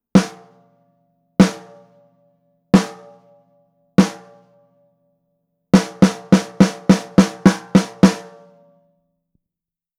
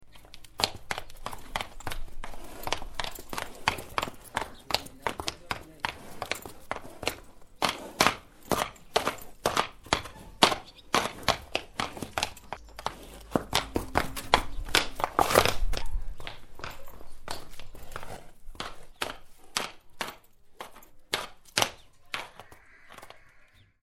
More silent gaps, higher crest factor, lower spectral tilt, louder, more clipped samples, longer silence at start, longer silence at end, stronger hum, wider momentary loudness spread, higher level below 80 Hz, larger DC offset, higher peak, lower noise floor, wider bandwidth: neither; second, 18 dB vs 32 dB; first, -6.5 dB/octave vs -2.5 dB/octave; first, -16 LUFS vs -31 LUFS; neither; first, 0.15 s vs 0 s; first, 1.75 s vs 0.4 s; neither; second, 10 LU vs 20 LU; second, -48 dBFS vs -42 dBFS; neither; about the same, 0 dBFS vs 0 dBFS; first, -88 dBFS vs -57 dBFS; second, 12.5 kHz vs 16.5 kHz